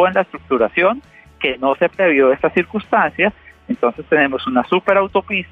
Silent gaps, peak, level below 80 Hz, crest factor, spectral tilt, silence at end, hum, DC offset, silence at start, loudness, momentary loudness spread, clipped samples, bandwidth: none; -2 dBFS; -50 dBFS; 14 dB; -7.5 dB/octave; 0.05 s; none; under 0.1%; 0 s; -16 LUFS; 6 LU; under 0.1%; 4.8 kHz